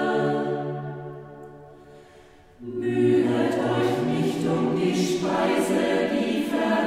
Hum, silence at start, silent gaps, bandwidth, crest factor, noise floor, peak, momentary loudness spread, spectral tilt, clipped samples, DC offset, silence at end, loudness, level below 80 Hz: none; 0 s; none; 15.5 kHz; 14 dB; -51 dBFS; -10 dBFS; 17 LU; -6 dB/octave; under 0.1%; under 0.1%; 0 s; -24 LUFS; -60 dBFS